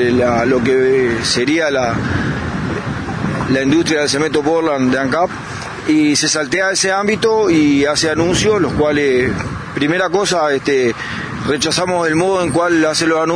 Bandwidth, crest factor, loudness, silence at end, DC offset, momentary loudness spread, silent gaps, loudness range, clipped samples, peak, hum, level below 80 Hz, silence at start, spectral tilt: 11 kHz; 14 dB; -15 LUFS; 0 s; under 0.1%; 8 LU; none; 3 LU; under 0.1%; -2 dBFS; none; -40 dBFS; 0 s; -4 dB/octave